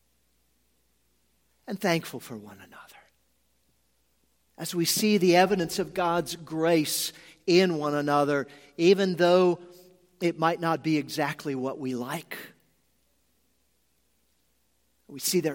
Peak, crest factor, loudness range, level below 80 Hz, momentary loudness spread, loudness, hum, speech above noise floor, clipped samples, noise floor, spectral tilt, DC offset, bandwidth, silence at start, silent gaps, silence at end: -6 dBFS; 22 dB; 11 LU; -68 dBFS; 18 LU; -26 LUFS; none; 46 dB; under 0.1%; -71 dBFS; -4.5 dB/octave; under 0.1%; 17 kHz; 1.7 s; none; 0 s